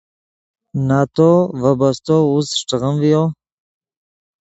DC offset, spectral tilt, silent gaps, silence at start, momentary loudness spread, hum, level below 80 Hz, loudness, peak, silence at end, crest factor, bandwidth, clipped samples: under 0.1%; -6.5 dB/octave; none; 0.75 s; 7 LU; none; -52 dBFS; -16 LUFS; 0 dBFS; 1.1 s; 16 dB; 8.2 kHz; under 0.1%